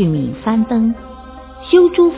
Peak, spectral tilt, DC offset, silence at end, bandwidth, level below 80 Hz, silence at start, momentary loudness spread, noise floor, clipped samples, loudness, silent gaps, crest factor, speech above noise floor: 0 dBFS; -12 dB/octave; under 0.1%; 0 s; 4 kHz; -40 dBFS; 0 s; 23 LU; -34 dBFS; under 0.1%; -14 LUFS; none; 14 dB; 21 dB